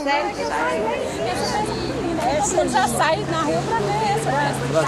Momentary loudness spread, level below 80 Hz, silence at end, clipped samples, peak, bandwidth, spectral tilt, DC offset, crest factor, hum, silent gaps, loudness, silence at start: 5 LU; -42 dBFS; 0 s; under 0.1%; -6 dBFS; 15 kHz; -4 dB/octave; under 0.1%; 16 dB; none; none; -21 LUFS; 0 s